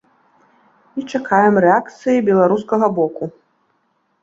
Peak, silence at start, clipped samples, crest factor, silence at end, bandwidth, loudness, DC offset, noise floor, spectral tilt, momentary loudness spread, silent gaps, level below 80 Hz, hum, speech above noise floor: -2 dBFS; 0.95 s; under 0.1%; 16 dB; 0.9 s; 7.8 kHz; -16 LUFS; under 0.1%; -65 dBFS; -7.5 dB/octave; 17 LU; none; -62 dBFS; none; 49 dB